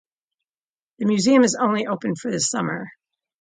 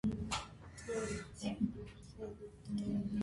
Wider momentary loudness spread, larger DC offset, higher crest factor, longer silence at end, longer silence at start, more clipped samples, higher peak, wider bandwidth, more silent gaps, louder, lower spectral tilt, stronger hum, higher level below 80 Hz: about the same, 11 LU vs 13 LU; neither; about the same, 18 dB vs 18 dB; first, 0.5 s vs 0 s; first, 1 s vs 0.05 s; neither; first, -4 dBFS vs -24 dBFS; second, 9.6 kHz vs 11.5 kHz; neither; first, -21 LUFS vs -42 LUFS; second, -4 dB/octave vs -5.5 dB/octave; neither; second, -66 dBFS vs -56 dBFS